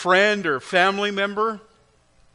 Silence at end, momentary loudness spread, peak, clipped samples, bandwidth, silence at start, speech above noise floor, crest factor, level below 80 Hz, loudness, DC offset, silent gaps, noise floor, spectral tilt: 0.75 s; 8 LU; -4 dBFS; under 0.1%; 10.5 kHz; 0 s; 38 dB; 18 dB; -64 dBFS; -20 LUFS; under 0.1%; none; -59 dBFS; -4 dB/octave